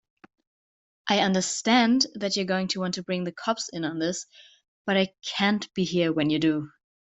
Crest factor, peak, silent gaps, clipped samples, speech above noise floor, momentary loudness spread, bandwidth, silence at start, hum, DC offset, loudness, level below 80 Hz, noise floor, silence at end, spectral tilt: 22 dB; -6 dBFS; 4.68-4.85 s; under 0.1%; over 65 dB; 9 LU; 8.2 kHz; 1.05 s; none; under 0.1%; -25 LUFS; -68 dBFS; under -90 dBFS; 0.35 s; -4 dB/octave